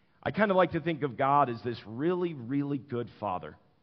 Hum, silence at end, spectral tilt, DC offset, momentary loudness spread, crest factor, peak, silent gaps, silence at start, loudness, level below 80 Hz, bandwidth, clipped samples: none; 0.3 s; -5.5 dB/octave; under 0.1%; 12 LU; 20 dB; -10 dBFS; none; 0.25 s; -30 LUFS; -66 dBFS; 5.8 kHz; under 0.1%